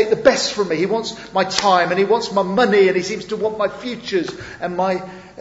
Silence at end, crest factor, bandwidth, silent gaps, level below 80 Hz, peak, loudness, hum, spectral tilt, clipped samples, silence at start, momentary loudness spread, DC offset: 0 s; 18 dB; 8 kHz; none; -54 dBFS; 0 dBFS; -18 LUFS; none; -4 dB/octave; under 0.1%; 0 s; 11 LU; under 0.1%